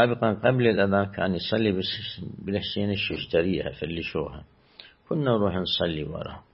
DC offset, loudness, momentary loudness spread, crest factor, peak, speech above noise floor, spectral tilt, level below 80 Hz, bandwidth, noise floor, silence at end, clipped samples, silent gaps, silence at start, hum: under 0.1%; -26 LUFS; 11 LU; 20 dB; -6 dBFS; 26 dB; -10.5 dB/octave; -52 dBFS; 5.8 kHz; -52 dBFS; 0.15 s; under 0.1%; none; 0 s; none